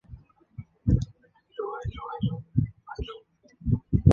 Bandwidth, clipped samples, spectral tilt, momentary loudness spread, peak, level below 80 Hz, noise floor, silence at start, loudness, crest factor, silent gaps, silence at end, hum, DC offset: 7 kHz; under 0.1%; -9.5 dB/octave; 20 LU; -4 dBFS; -38 dBFS; -57 dBFS; 0.1 s; -30 LUFS; 24 dB; none; 0 s; none; under 0.1%